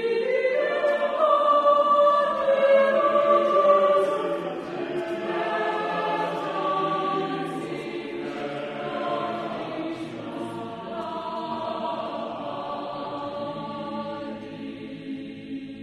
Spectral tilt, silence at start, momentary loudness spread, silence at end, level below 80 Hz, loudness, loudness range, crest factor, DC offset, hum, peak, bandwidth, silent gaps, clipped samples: -6 dB/octave; 0 s; 15 LU; 0 s; -66 dBFS; -25 LUFS; 12 LU; 18 dB; under 0.1%; none; -6 dBFS; 10.5 kHz; none; under 0.1%